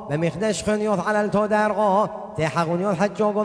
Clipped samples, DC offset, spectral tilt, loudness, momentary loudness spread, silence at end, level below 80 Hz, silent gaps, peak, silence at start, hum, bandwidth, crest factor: under 0.1%; under 0.1%; -6 dB/octave; -22 LUFS; 5 LU; 0 s; -54 dBFS; none; -8 dBFS; 0 s; none; 11 kHz; 14 dB